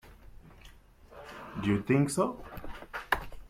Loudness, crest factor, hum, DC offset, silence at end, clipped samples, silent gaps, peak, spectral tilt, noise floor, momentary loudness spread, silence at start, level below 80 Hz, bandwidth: -31 LUFS; 22 dB; none; under 0.1%; 0 s; under 0.1%; none; -10 dBFS; -6 dB/octave; -55 dBFS; 19 LU; 0.05 s; -52 dBFS; 16 kHz